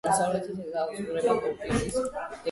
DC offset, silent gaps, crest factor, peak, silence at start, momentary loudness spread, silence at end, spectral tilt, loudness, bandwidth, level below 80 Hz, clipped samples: under 0.1%; none; 16 dB; -12 dBFS; 0.05 s; 8 LU; 0 s; -4.5 dB/octave; -29 LUFS; 11.5 kHz; -50 dBFS; under 0.1%